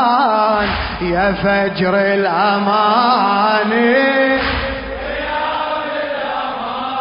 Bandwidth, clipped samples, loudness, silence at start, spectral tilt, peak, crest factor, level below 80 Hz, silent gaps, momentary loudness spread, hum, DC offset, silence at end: 5.4 kHz; under 0.1%; -15 LUFS; 0 s; -10 dB/octave; 0 dBFS; 14 dB; -36 dBFS; none; 9 LU; none; under 0.1%; 0 s